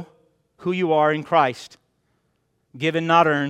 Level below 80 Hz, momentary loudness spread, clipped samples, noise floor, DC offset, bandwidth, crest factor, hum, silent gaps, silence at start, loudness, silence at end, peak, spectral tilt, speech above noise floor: -70 dBFS; 11 LU; under 0.1%; -69 dBFS; under 0.1%; 12 kHz; 20 dB; none; none; 0 s; -20 LUFS; 0 s; -2 dBFS; -6 dB/octave; 50 dB